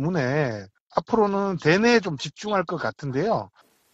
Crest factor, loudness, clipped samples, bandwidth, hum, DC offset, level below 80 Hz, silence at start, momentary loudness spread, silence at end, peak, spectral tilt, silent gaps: 20 dB; -24 LUFS; under 0.1%; 8 kHz; none; under 0.1%; -58 dBFS; 0 s; 11 LU; 0.45 s; -4 dBFS; -6 dB/octave; 0.80-0.87 s